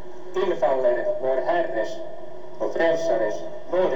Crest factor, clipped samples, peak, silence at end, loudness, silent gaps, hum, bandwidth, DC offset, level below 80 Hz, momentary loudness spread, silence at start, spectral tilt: 14 dB; under 0.1%; -8 dBFS; 0 s; -24 LUFS; none; none; 7.6 kHz; 4%; -66 dBFS; 14 LU; 0 s; -5.5 dB/octave